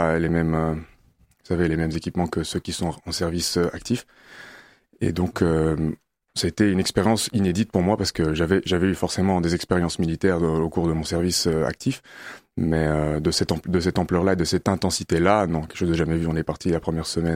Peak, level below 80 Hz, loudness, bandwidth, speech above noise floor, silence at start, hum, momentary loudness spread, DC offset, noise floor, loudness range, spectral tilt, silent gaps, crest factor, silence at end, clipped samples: -2 dBFS; -40 dBFS; -23 LUFS; 16 kHz; 37 dB; 0 s; none; 7 LU; under 0.1%; -59 dBFS; 4 LU; -5.5 dB/octave; none; 20 dB; 0 s; under 0.1%